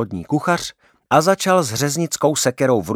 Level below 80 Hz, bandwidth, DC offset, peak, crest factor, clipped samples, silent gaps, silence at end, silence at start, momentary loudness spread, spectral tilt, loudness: -54 dBFS; 18.5 kHz; under 0.1%; 0 dBFS; 18 dB; under 0.1%; none; 0 s; 0 s; 6 LU; -4.5 dB/octave; -18 LUFS